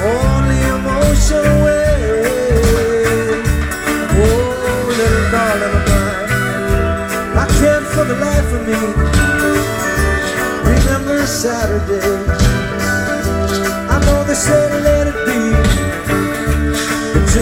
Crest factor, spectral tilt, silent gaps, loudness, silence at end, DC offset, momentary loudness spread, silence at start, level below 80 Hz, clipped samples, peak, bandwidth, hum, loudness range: 12 dB; -5 dB/octave; none; -14 LUFS; 0 s; under 0.1%; 4 LU; 0 s; -20 dBFS; under 0.1%; 0 dBFS; 17 kHz; none; 2 LU